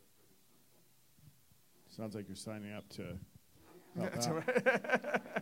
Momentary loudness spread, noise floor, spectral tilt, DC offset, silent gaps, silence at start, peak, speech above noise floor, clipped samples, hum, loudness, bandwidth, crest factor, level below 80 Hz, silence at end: 17 LU; -70 dBFS; -4.5 dB/octave; under 0.1%; none; 1.25 s; -16 dBFS; 32 dB; under 0.1%; none; -38 LUFS; 16 kHz; 24 dB; -72 dBFS; 0 s